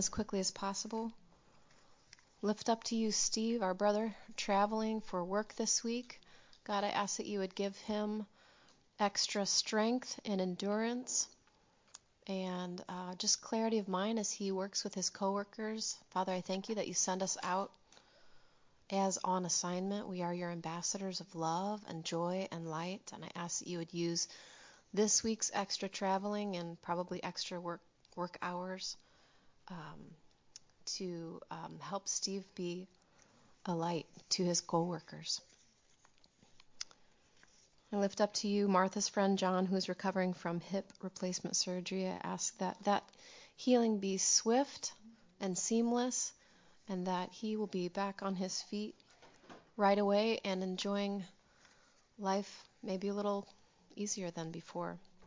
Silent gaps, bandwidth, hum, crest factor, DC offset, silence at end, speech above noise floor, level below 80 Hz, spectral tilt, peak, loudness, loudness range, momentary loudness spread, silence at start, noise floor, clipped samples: none; 7.8 kHz; none; 22 dB; under 0.1%; 0 s; 34 dB; -74 dBFS; -3.5 dB/octave; -16 dBFS; -37 LUFS; 7 LU; 13 LU; 0 s; -71 dBFS; under 0.1%